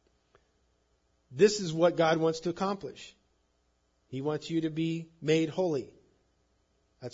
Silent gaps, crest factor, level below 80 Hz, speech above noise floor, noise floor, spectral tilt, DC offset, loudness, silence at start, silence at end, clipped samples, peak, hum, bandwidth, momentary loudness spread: none; 22 dB; -70 dBFS; 44 dB; -73 dBFS; -5.5 dB/octave; under 0.1%; -29 LUFS; 1.3 s; 0.05 s; under 0.1%; -10 dBFS; none; 7.8 kHz; 20 LU